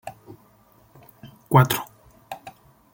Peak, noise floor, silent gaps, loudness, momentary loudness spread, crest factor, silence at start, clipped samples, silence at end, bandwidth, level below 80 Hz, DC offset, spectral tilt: -2 dBFS; -57 dBFS; none; -20 LUFS; 24 LU; 24 dB; 0.05 s; under 0.1%; 0.45 s; 17 kHz; -58 dBFS; under 0.1%; -6 dB/octave